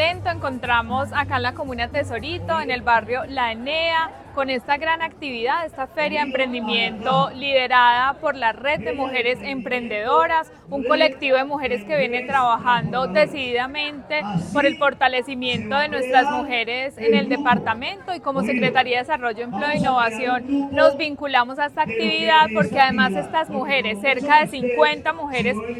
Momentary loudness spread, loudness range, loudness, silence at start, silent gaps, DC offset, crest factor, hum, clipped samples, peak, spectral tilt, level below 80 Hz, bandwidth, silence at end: 8 LU; 4 LU; -20 LUFS; 0 s; none; under 0.1%; 20 dB; none; under 0.1%; 0 dBFS; -5 dB/octave; -50 dBFS; 14 kHz; 0 s